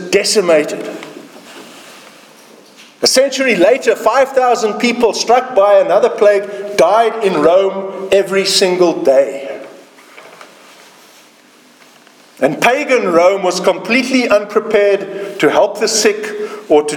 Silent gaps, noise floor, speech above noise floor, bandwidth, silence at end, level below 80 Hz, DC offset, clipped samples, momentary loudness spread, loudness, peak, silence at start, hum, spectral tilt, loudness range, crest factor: none; -45 dBFS; 33 dB; 18.5 kHz; 0 s; -58 dBFS; under 0.1%; under 0.1%; 11 LU; -12 LUFS; 0 dBFS; 0 s; none; -3 dB/octave; 6 LU; 14 dB